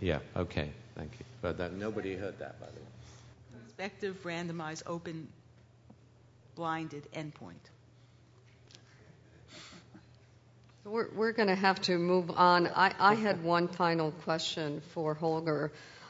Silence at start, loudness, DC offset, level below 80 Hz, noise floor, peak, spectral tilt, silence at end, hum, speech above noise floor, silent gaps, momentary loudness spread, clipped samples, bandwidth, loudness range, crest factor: 0 s; -32 LUFS; under 0.1%; -62 dBFS; -61 dBFS; -10 dBFS; -3.5 dB/octave; 0 s; none; 28 dB; none; 24 LU; under 0.1%; 7.6 kHz; 16 LU; 24 dB